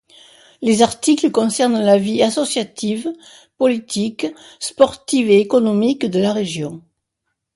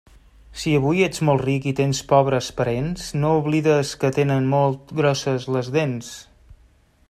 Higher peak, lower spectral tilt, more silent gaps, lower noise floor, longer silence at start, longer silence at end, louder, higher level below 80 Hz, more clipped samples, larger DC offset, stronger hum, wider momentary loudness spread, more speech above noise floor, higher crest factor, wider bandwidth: about the same, 0 dBFS vs -2 dBFS; second, -4.5 dB/octave vs -6 dB/octave; neither; first, -76 dBFS vs -56 dBFS; about the same, 0.6 s vs 0.5 s; first, 0.75 s vs 0.55 s; first, -17 LUFS vs -21 LUFS; second, -58 dBFS vs -48 dBFS; neither; neither; neither; first, 13 LU vs 8 LU; first, 59 dB vs 35 dB; about the same, 18 dB vs 20 dB; second, 11.5 kHz vs 13.5 kHz